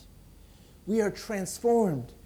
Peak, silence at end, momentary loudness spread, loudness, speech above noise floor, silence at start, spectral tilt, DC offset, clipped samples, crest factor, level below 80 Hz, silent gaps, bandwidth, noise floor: -14 dBFS; 0.1 s; 9 LU; -28 LUFS; 25 dB; 0.85 s; -5.5 dB/octave; under 0.1%; under 0.1%; 16 dB; -56 dBFS; none; 20 kHz; -53 dBFS